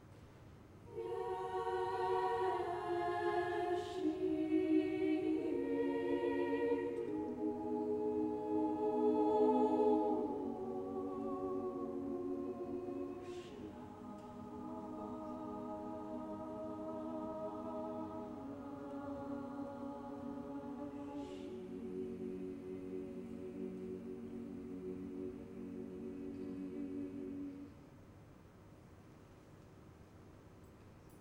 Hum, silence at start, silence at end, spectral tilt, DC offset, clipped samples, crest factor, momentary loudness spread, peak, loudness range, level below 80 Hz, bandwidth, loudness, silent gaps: none; 0 s; 0 s; -7.5 dB/octave; under 0.1%; under 0.1%; 18 dB; 24 LU; -22 dBFS; 12 LU; -68 dBFS; 11.5 kHz; -41 LUFS; none